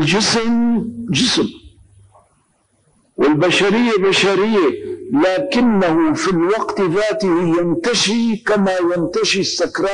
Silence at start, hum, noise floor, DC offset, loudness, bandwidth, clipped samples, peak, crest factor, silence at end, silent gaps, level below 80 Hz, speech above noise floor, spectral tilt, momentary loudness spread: 0 s; none; -60 dBFS; under 0.1%; -16 LUFS; 10 kHz; under 0.1%; -6 dBFS; 10 dB; 0 s; none; -50 dBFS; 45 dB; -4.5 dB/octave; 5 LU